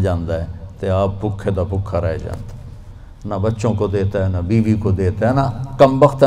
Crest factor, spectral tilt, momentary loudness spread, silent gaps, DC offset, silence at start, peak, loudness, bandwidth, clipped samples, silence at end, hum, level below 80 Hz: 18 dB; -8.5 dB/octave; 16 LU; none; under 0.1%; 0 s; 0 dBFS; -18 LUFS; 10 kHz; under 0.1%; 0 s; none; -34 dBFS